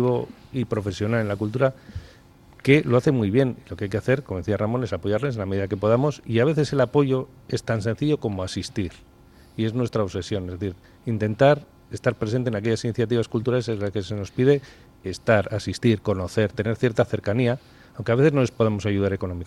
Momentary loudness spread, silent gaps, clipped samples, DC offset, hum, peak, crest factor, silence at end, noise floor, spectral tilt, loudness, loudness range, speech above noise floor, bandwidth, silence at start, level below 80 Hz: 11 LU; none; under 0.1%; under 0.1%; none; -2 dBFS; 22 dB; 0 s; -50 dBFS; -7 dB/octave; -24 LUFS; 3 LU; 28 dB; 12 kHz; 0 s; -52 dBFS